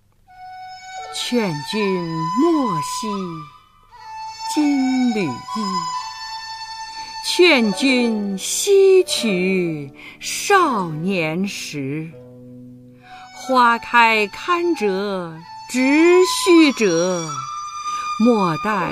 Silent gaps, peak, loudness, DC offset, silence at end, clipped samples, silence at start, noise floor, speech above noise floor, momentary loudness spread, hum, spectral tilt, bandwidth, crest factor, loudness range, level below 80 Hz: none; -2 dBFS; -18 LUFS; under 0.1%; 0 s; under 0.1%; 0.35 s; -46 dBFS; 29 dB; 17 LU; none; -4 dB/octave; 15.5 kHz; 18 dB; 6 LU; -58 dBFS